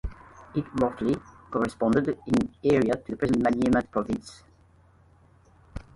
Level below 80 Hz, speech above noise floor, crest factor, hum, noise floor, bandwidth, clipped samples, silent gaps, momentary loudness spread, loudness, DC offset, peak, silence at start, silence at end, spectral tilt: -48 dBFS; 33 dB; 18 dB; none; -58 dBFS; 11.5 kHz; under 0.1%; none; 10 LU; -26 LUFS; under 0.1%; -10 dBFS; 0.05 s; 0.15 s; -7 dB/octave